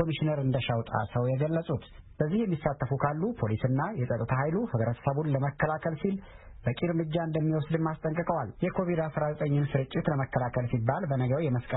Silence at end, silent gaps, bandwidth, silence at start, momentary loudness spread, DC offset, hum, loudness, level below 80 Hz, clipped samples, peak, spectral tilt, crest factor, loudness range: 0 s; none; 4 kHz; 0 s; 3 LU; under 0.1%; none; -30 LUFS; -52 dBFS; under 0.1%; -10 dBFS; -12 dB/octave; 18 dB; 1 LU